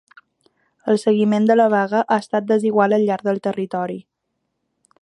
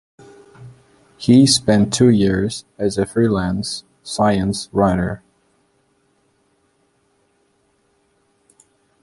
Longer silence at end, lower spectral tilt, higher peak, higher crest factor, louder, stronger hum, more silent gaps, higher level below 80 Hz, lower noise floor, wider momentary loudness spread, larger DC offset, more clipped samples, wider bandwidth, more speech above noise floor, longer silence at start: second, 1 s vs 3.85 s; first, -7 dB/octave vs -5 dB/octave; about the same, -2 dBFS vs -2 dBFS; about the same, 16 dB vs 18 dB; about the same, -18 LUFS vs -17 LUFS; neither; neither; second, -70 dBFS vs -44 dBFS; first, -75 dBFS vs -62 dBFS; second, 10 LU vs 13 LU; neither; neither; about the same, 11 kHz vs 11.5 kHz; first, 57 dB vs 46 dB; first, 0.85 s vs 0.6 s